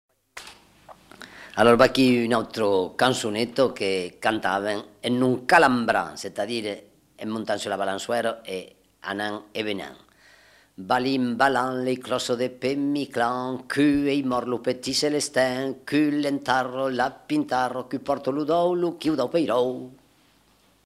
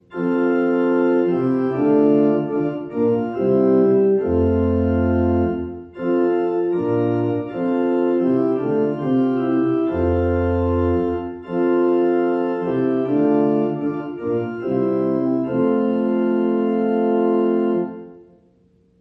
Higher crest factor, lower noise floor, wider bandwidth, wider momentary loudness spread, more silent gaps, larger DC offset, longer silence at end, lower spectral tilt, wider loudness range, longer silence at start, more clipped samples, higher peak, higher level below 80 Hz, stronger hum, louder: first, 24 dB vs 12 dB; first, -61 dBFS vs -57 dBFS; first, 15 kHz vs 5.6 kHz; first, 13 LU vs 6 LU; neither; neither; about the same, 0.9 s vs 0.8 s; second, -4.5 dB/octave vs -11 dB/octave; first, 7 LU vs 2 LU; first, 0.35 s vs 0.1 s; neither; first, -2 dBFS vs -6 dBFS; second, -58 dBFS vs -42 dBFS; neither; second, -24 LUFS vs -19 LUFS